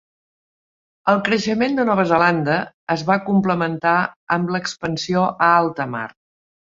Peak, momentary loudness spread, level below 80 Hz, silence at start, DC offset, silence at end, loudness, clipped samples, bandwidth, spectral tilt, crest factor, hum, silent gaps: -2 dBFS; 9 LU; -58 dBFS; 1.05 s; under 0.1%; 0.6 s; -19 LUFS; under 0.1%; 7.6 kHz; -6 dB/octave; 18 dB; none; 2.74-2.87 s, 4.16-4.27 s